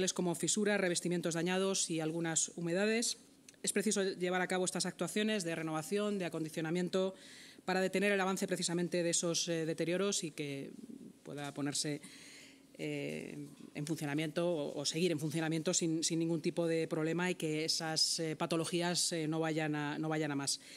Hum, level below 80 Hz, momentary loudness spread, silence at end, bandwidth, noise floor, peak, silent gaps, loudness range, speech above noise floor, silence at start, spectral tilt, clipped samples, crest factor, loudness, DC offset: none; -86 dBFS; 12 LU; 0 s; 16 kHz; -57 dBFS; -18 dBFS; none; 6 LU; 22 dB; 0 s; -3.5 dB/octave; under 0.1%; 18 dB; -35 LUFS; under 0.1%